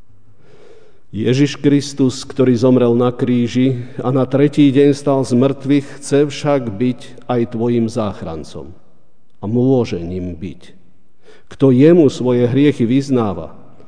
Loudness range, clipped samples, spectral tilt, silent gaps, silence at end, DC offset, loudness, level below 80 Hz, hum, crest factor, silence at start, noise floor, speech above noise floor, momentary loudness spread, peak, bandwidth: 6 LU; under 0.1%; -7.5 dB/octave; none; 0.35 s; 2%; -15 LUFS; -50 dBFS; none; 16 dB; 1.15 s; -58 dBFS; 43 dB; 16 LU; 0 dBFS; 10 kHz